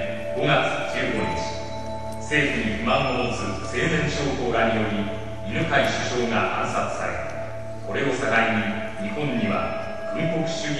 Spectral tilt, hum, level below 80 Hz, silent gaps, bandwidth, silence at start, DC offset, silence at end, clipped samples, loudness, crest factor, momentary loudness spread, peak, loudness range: -5 dB/octave; none; -44 dBFS; none; 12.5 kHz; 0 s; 2%; 0 s; under 0.1%; -24 LUFS; 18 dB; 10 LU; -6 dBFS; 2 LU